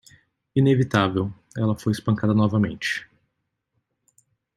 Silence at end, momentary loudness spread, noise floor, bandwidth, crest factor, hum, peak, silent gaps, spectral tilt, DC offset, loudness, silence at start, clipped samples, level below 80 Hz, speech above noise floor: 1.55 s; 8 LU; -77 dBFS; 13 kHz; 20 dB; none; -4 dBFS; none; -7 dB/octave; under 0.1%; -23 LUFS; 0.55 s; under 0.1%; -58 dBFS; 56 dB